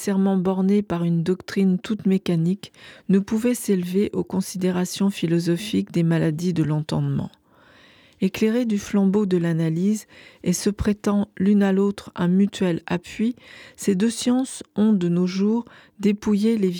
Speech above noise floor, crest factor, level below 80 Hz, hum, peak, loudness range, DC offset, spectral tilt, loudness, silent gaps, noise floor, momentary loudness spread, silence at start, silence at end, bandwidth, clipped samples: 31 dB; 14 dB; -50 dBFS; none; -8 dBFS; 2 LU; under 0.1%; -6.5 dB/octave; -22 LUFS; none; -53 dBFS; 6 LU; 0 s; 0 s; 17.5 kHz; under 0.1%